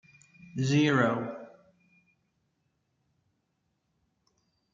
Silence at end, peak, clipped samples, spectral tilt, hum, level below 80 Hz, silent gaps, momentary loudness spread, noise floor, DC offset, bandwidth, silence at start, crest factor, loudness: 3.25 s; -12 dBFS; under 0.1%; -6 dB/octave; none; -72 dBFS; none; 18 LU; -78 dBFS; under 0.1%; 7.6 kHz; 0.55 s; 22 dB; -27 LUFS